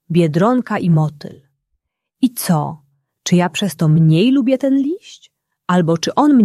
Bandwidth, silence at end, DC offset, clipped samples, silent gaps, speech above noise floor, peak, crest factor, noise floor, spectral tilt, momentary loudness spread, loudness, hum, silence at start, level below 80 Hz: 14 kHz; 0 s; under 0.1%; under 0.1%; none; 58 dB; -2 dBFS; 14 dB; -72 dBFS; -6.5 dB/octave; 14 LU; -16 LUFS; none; 0.1 s; -58 dBFS